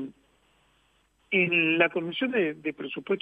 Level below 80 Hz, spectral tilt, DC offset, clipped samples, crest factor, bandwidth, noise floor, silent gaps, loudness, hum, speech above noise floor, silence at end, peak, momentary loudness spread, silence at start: -72 dBFS; -7.5 dB/octave; under 0.1%; under 0.1%; 22 dB; 8 kHz; -67 dBFS; none; -26 LUFS; none; 41 dB; 0 s; -8 dBFS; 13 LU; 0 s